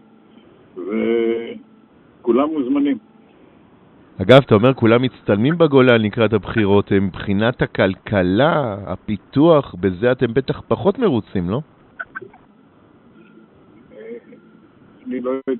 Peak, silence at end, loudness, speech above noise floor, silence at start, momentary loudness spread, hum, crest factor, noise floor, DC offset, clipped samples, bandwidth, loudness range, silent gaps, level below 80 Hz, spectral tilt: 0 dBFS; 0 s; -17 LUFS; 34 dB; 0.75 s; 19 LU; none; 18 dB; -50 dBFS; under 0.1%; under 0.1%; 4.6 kHz; 9 LU; none; -50 dBFS; -5.5 dB/octave